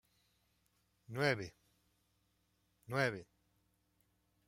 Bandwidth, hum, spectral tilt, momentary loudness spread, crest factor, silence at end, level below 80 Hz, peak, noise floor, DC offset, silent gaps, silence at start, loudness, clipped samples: 16 kHz; none; -5.5 dB/octave; 15 LU; 26 dB; 1.25 s; -76 dBFS; -20 dBFS; -79 dBFS; under 0.1%; none; 1.1 s; -38 LUFS; under 0.1%